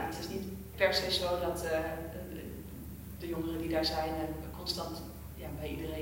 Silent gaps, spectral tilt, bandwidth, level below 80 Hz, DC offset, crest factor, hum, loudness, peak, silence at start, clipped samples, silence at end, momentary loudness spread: none; -4.5 dB/octave; 16 kHz; -50 dBFS; under 0.1%; 24 dB; none; -35 LUFS; -12 dBFS; 0 s; under 0.1%; 0 s; 15 LU